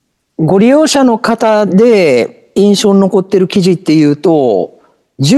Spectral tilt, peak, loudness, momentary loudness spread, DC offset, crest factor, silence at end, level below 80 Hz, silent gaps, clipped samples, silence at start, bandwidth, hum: -6 dB/octave; 0 dBFS; -9 LUFS; 8 LU; under 0.1%; 10 dB; 0 s; -52 dBFS; none; under 0.1%; 0.4 s; 12.5 kHz; none